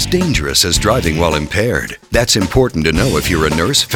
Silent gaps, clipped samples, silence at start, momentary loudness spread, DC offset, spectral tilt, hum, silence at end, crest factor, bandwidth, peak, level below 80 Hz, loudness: none; under 0.1%; 0 s; 4 LU; under 0.1%; -4 dB/octave; none; 0 s; 14 dB; over 20 kHz; 0 dBFS; -26 dBFS; -14 LUFS